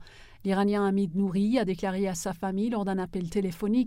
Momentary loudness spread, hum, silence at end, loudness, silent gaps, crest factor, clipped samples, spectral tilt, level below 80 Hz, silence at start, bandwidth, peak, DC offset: 6 LU; none; 0 s; -28 LUFS; none; 14 dB; under 0.1%; -6.5 dB/octave; -52 dBFS; 0 s; 15.5 kHz; -14 dBFS; under 0.1%